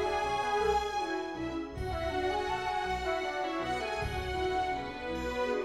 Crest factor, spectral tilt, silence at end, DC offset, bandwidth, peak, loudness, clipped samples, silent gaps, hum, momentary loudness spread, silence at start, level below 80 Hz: 14 dB; -5 dB/octave; 0 s; under 0.1%; 15 kHz; -18 dBFS; -33 LUFS; under 0.1%; none; none; 7 LU; 0 s; -46 dBFS